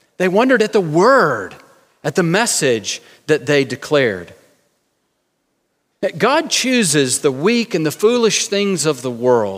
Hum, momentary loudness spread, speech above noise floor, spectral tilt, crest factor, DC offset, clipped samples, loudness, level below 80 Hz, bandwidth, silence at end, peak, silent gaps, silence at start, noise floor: none; 10 LU; 52 dB; -3.5 dB/octave; 16 dB; under 0.1%; under 0.1%; -16 LUFS; -66 dBFS; 16 kHz; 0 s; 0 dBFS; none; 0.2 s; -68 dBFS